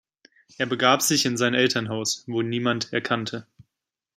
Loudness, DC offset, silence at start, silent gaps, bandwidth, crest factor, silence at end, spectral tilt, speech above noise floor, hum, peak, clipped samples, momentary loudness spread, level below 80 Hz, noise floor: -23 LUFS; under 0.1%; 0.6 s; none; 16 kHz; 22 dB; 0.75 s; -3 dB/octave; 61 dB; none; -2 dBFS; under 0.1%; 9 LU; -68 dBFS; -84 dBFS